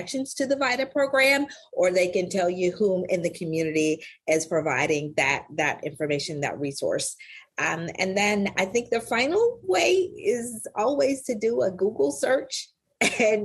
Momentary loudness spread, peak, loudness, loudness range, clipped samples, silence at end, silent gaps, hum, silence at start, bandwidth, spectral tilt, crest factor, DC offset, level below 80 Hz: 8 LU; -8 dBFS; -25 LUFS; 3 LU; under 0.1%; 0 s; none; none; 0 s; 13 kHz; -3.5 dB/octave; 18 dB; under 0.1%; -62 dBFS